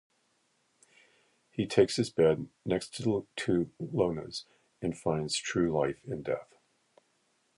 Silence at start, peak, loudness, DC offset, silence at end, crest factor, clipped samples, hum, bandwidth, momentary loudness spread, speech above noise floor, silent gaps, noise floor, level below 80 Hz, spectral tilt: 1.55 s; -10 dBFS; -31 LUFS; under 0.1%; 1.15 s; 22 dB; under 0.1%; none; 11.5 kHz; 11 LU; 43 dB; none; -73 dBFS; -60 dBFS; -5.5 dB/octave